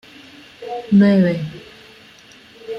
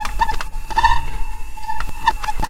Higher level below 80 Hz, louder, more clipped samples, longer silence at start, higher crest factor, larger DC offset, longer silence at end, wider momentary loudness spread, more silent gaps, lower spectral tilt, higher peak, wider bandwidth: second, -58 dBFS vs -24 dBFS; first, -15 LUFS vs -21 LUFS; neither; first, 0.6 s vs 0 s; about the same, 16 dB vs 16 dB; neither; about the same, 0 s vs 0 s; first, 25 LU vs 15 LU; neither; first, -8.5 dB/octave vs -3 dB/octave; second, -4 dBFS vs 0 dBFS; second, 6.4 kHz vs 15 kHz